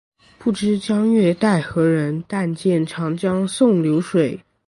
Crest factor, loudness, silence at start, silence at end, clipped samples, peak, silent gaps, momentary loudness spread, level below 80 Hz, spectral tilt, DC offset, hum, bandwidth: 14 dB; -19 LUFS; 0.4 s; 0.3 s; under 0.1%; -4 dBFS; none; 7 LU; -56 dBFS; -7 dB/octave; under 0.1%; none; 11.5 kHz